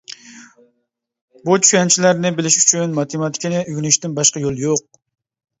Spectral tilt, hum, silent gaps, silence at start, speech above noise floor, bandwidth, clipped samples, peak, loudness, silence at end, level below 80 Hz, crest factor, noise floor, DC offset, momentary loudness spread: -3 dB/octave; none; 1.21-1.28 s; 0.1 s; 56 dB; 8.4 kHz; under 0.1%; 0 dBFS; -15 LUFS; 0.8 s; -58 dBFS; 18 dB; -72 dBFS; under 0.1%; 10 LU